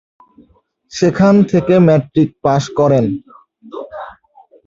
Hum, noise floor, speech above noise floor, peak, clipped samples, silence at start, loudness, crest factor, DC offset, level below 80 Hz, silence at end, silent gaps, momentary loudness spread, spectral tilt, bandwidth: none; -54 dBFS; 42 dB; 0 dBFS; under 0.1%; 0.95 s; -13 LUFS; 14 dB; under 0.1%; -50 dBFS; 0.55 s; none; 20 LU; -7.5 dB/octave; 7.8 kHz